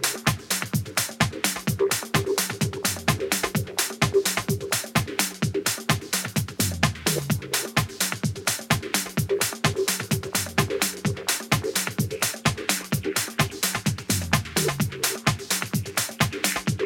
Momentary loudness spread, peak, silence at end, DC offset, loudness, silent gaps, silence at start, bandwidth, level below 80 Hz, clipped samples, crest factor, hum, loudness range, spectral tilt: 3 LU; -2 dBFS; 0 s; under 0.1%; -25 LUFS; none; 0 s; 17.5 kHz; -48 dBFS; under 0.1%; 24 dB; none; 1 LU; -3.5 dB/octave